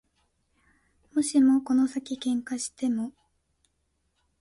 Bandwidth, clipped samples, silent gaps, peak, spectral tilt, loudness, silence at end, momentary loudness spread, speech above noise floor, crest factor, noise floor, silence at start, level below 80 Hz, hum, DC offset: 11.5 kHz; under 0.1%; none; -12 dBFS; -3.5 dB/octave; -26 LUFS; 1.3 s; 11 LU; 49 dB; 16 dB; -74 dBFS; 1.15 s; -68 dBFS; none; under 0.1%